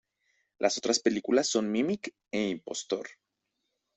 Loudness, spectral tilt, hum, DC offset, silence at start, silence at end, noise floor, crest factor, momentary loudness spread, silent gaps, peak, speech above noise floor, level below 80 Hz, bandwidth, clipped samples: -30 LUFS; -3 dB/octave; none; under 0.1%; 0.6 s; 0.85 s; -82 dBFS; 20 dB; 9 LU; none; -10 dBFS; 53 dB; -72 dBFS; 8.4 kHz; under 0.1%